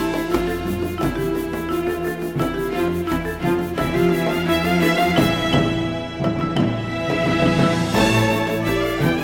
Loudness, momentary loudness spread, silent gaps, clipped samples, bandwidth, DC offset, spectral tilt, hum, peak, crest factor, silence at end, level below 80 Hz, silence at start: -20 LUFS; 7 LU; none; under 0.1%; 19 kHz; under 0.1%; -6 dB/octave; none; -4 dBFS; 16 dB; 0 s; -38 dBFS; 0 s